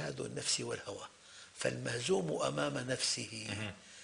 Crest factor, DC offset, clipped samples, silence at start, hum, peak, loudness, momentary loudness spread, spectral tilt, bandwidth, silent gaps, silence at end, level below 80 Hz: 20 dB; under 0.1%; under 0.1%; 0 s; none; -18 dBFS; -37 LUFS; 13 LU; -3 dB/octave; 12.5 kHz; none; 0 s; -70 dBFS